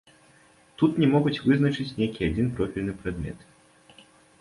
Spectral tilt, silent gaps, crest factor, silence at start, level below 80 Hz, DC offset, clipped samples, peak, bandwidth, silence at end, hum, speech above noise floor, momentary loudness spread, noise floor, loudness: -8 dB/octave; none; 18 dB; 0.8 s; -46 dBFS; under 0.1%; under 0.1%; -8 dBFS; 11.5 kHz; 1.05 s; none; 33 dB; 12 LU; -57 dBFS; -25 LUFS